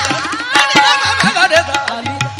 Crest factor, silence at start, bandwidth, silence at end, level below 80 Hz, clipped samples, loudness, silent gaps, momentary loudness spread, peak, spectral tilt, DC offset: 14 dB; 0 s; over 20 kHz; 0 s; -50 dBFS; 0.2%; -12 LUFS; none; 9 LU; 0 dBFS; -2.5 dB/octave; under 0.1%